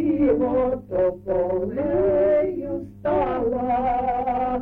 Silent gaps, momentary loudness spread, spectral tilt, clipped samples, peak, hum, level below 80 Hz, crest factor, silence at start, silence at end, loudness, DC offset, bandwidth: none; 5 LU; -10 dB/octave; under 0.1%; -10 dBFS; none; -42 dBFS; 12 dB; 0 s; 0 s; -22 LUFS; under 0.1%; 4.3 kHz